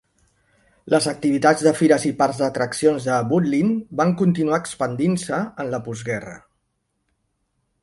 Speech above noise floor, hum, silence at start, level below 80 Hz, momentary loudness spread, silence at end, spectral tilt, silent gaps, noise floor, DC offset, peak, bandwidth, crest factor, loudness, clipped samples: 53 dB; none; 0.85 s; -58 dBFS; 10 LU; 1.45 s; -6 dB/octave; none; -73 dBFS; under 0.1%; -2 dBFS; 11.5 kHz; 18 dB; -20 LUFS; under 0.1%